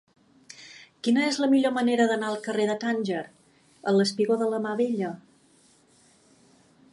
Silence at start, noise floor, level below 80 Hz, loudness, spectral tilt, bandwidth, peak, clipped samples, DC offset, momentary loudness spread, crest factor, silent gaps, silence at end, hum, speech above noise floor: 0.6 s; -60 dBFS; -78 dBFS; -25 LUFS; -5 dB/octave; 11.5 kHz; -10 dBFS; under 0.1%; under 0.1%; 22 LU; 18 dB; none; 1.75 s; none; 36 dB